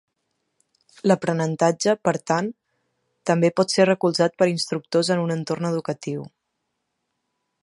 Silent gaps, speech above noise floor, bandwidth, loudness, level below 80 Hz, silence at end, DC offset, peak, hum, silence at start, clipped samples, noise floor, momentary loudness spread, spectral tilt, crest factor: none; 56 dB; 11.5 kHz; -22 LUFS; -72 dBFS; 1.35 s; under 0.1%; -2 dBFS; none; 1.05 s; under 0.1%; -77 dBFS; 10 LU; -5 dB/octave; 20 dB